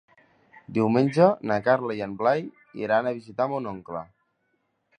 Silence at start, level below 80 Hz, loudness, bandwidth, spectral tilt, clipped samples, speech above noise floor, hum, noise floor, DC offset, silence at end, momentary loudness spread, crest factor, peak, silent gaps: 0.55 s; -66 dBFS; -24 LUFS; 10 kHz; -8 dB/octave; under 0.1%; 49 dB; none; -73 dBFS; under 0.1%; 0.95 s; 15 LU; 22 dB; -4 dBFS; none